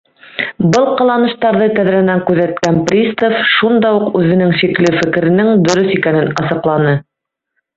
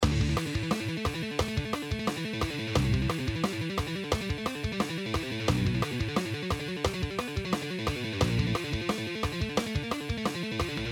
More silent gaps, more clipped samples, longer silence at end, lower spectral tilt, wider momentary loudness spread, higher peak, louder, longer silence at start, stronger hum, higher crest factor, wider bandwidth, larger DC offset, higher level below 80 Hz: neither; neither; first, 0.75 s vs 0 s; about the same, -6 dB/octave vs -5.5 dB/octave; about the same, 5 LU vs 5 LU; first, 0 dBFS vs -10 dBFS; first, -12 LUFS vs -31 LUFS; first, 0.35 s vs 0 s; neither; second, 12 dB vs 20 dB; second, 8 kHz vs 19.5 kHz; neither; second, -50 dBFS vs -40 dBFS